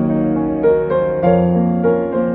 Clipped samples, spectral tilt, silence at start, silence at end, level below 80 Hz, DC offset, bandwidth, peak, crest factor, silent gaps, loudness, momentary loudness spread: under 0.1%; -13 dB/octave; 0 s; 0 s; -40 dBFS; under 0.1%; 4 kHz; 0 dBFS; 14 dB; none; -15 LUFS; 3 LU